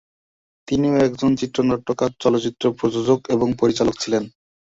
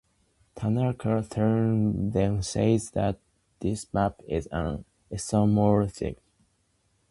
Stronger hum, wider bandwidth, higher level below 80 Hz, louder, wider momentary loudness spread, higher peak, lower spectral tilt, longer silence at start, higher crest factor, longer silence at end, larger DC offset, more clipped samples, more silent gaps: neither; second, 8 kHz vs 11.5 kHz; about the same, -50 dBFS vs -46 dBFS; first, -20 LUFS vs -27 LUFS; second, 5 LU vs 12 LU; first, -4 dBFS vs -8 dBFS; about the same, -6 dB/octave vs -7 dB/octave; first, 0.7 s vs 0.55 s; about the same, 16 dB vs 18 dB; second, 0.4 s vs 0.95 s; neither; neither; neither